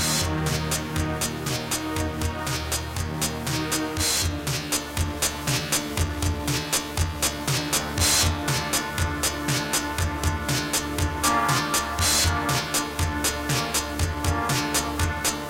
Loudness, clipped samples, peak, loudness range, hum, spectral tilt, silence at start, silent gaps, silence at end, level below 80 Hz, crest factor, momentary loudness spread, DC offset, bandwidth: -24 LUFS; under 0.1%; -8 dBFS; 3 LU; none; -3 dB/octave; 0 s; none; 0 s; -36 dBFS; 16 dB; 6 LU; under 0.1%; 17 kHz